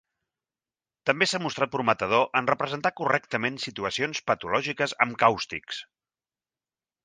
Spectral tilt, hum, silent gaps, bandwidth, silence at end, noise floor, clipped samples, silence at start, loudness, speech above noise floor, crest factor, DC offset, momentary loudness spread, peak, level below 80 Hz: -4 dB/octave; none; none; 9.8 kHz; 1.2 s; under -90 dBFS; under 0.1%; 1.05 s; -26 LUFS; over 64 dB; 24 dB; under 0.1%; 8 LU; -4 dBFS; -64 dBFS